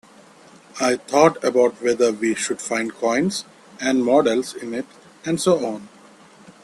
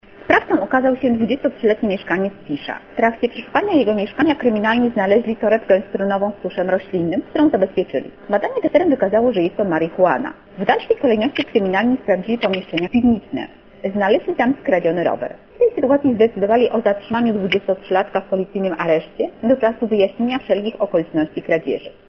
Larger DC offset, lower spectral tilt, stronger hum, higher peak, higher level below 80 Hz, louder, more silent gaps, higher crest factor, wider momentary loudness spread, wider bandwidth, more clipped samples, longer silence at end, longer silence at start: neither; second, -4 dB/octave vs -8 dB/octave; neither; about the same, 0 dBFS vs 0 dBFS; second, -64 dBFS vs -52 dBFS; about the same, -20 LUFS vs -18 LUFS; neither; about the same, 20 dB vs 16 dB; first, 14 LU vs 7 LU; first, 13 kHz vs 6.4 kHz; neither; first, 0.75 s vs 0.2 s; first, 0.75 s vs 0.2 s